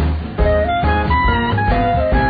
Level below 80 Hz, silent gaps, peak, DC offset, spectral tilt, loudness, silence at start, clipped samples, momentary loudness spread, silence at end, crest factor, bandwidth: -20 dBFS; none; -2 dBFS; under 0.1%; -10 dB/octave; -16 LUFS; 0 s; under 0.1%; 2 LU; 0 s; 12 dB; 5 kHz